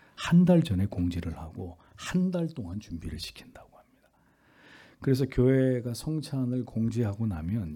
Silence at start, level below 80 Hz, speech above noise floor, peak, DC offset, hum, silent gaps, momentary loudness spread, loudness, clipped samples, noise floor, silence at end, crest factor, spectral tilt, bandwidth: 0.2 s; -50 dBFS; 37 dB; -10 dBFS; under 0.1%; none; none; 17 LU; -28 LUFS; under 0.1%; -65 dBFS; 0 s; 18 dB; -7.5 dB/octave; 14 kHz